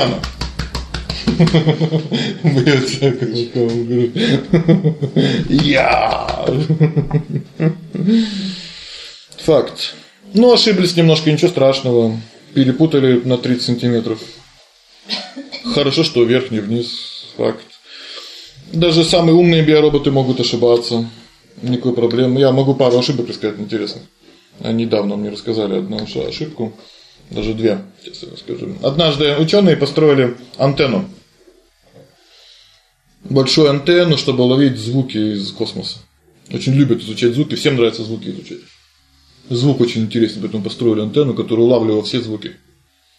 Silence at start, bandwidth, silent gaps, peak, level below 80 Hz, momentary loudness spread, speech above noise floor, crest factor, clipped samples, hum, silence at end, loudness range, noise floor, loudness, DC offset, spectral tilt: 0 s; 12 kHz; none; 0 dBFS; -40 dBFS; 15 LU; 41 dB; 14 dB; under 0.1%; none; 0.65 s; 6 LU; -55 dBFS; -15 LUFS; under 0.1%; -6.5 dB/octave